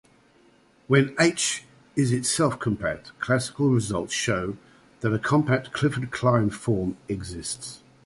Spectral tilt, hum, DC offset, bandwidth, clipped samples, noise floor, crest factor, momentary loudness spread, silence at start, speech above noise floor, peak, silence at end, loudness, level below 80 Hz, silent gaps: -5 dB/octave; none; under 0.1%; 11.5 kHz; under 0.1%; -58 dBFS; 20 dB; 11 LU; 0.9 s; 34 dB; -6 dBFS; 0.3 s; -25 LUFS; -52 dBFS; none